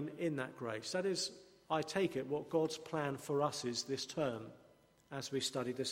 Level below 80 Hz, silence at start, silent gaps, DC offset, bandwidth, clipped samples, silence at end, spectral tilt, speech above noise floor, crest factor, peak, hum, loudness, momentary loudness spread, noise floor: -76 dBFS; 0 s; none; under 0.1%; 16 kHz; under 0.1%; 0 s; -4 dB/octave; 28 dB; 18 dB; -22 dBFS; none; -39 LUFS; 6 LU; -67 dBFS